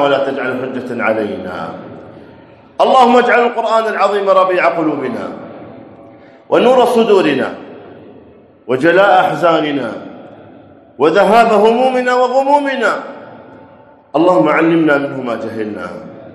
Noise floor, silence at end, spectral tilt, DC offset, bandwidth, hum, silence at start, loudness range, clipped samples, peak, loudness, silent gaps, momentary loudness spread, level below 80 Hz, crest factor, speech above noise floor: -42 dBFS; 0 s; -5.5 dB/octave; under 0.1%; 13 kHz; none; 0 s; 3 LU; 0.2%; 0 dBFS; -12 LUFS; none; 18 LU; -60 dBFS; 14 dB; 30 dB